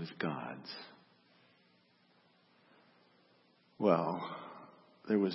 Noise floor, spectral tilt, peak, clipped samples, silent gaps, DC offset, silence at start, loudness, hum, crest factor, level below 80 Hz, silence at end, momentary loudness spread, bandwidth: -70 dBFS; -5.5 dB/octave; -14 dBFS; under 0.1%; none; under 0.1%; 0 s; -36 LUFS; 60 Hz at -70 dBFS; 26 dB; -88 dBFS; 0 s; 24 LU; 5.8 kHz